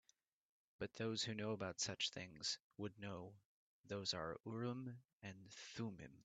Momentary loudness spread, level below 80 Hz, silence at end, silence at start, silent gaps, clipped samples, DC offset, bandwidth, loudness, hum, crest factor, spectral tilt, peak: 12 LU; -80 dBFS; 0 s; 0.8 s; 2.60-2.71 s, 3.45-3.84 s, 5.13-5.20 s; under 0.1%; under 0.1%; 9 kHz; -47 LUFS; none; 20 dB; -3.5 dB/octave; -28 dBFS